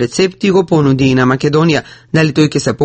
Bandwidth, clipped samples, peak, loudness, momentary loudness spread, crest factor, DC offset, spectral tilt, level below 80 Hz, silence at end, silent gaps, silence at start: 8.8 kHz; under 0.1%; 0 dBFS; -12 LUFS; 3 LU; 12 dB; under 0.1%; -6 dB/octave; -42 dBFS; 0 s; none; 0 s